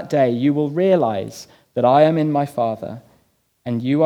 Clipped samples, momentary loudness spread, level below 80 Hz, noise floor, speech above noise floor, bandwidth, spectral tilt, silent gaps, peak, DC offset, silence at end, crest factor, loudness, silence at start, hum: under 0.1%; 19 LU; -66 dBFS; -61 dBFS; 43 dB; 15.5 kHz; -7.5 dB/octave; none; -2 dBFS; under 0.1%; 0 s; 16 dB; -18 LUFS; 0 s; none